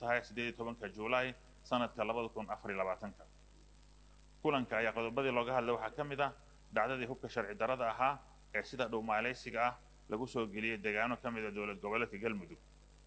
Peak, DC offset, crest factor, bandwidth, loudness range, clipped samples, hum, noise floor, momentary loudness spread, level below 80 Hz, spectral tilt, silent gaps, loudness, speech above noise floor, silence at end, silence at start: -18 dBFS; under 0.1%; 20 dB; 8.8 kHz; 3 LU; under 0.1%; 50 Hz at -60 dBFS; -61 dBFS; 8 LU; -62 dBFS; -5.5 dB/octave; none; -38 LUFS; 23 dB; 0.05 s; 0 s